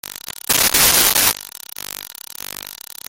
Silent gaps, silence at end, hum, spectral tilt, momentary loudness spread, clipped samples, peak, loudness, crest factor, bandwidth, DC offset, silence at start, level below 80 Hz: none; 0.35 s; none; 0 dB/octave; 20 LU; under 0.1%; 0 dBFS; -12 LUFS; 20 dB; over 20 kHz; under 0.1%; 0.1 s; -44 dBFS